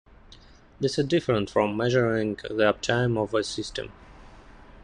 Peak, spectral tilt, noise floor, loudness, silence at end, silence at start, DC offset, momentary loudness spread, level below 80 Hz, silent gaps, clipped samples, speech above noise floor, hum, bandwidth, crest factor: -8 dBFS; -5.5 dB/octave; -51 dBFS; -25 LUFS; 0.05 s; 0.3 s; under 0.1%; 9 LU; -52 dBFS; none; under 0.1%; 26 dB; none; 10.5 kHz; 18 dB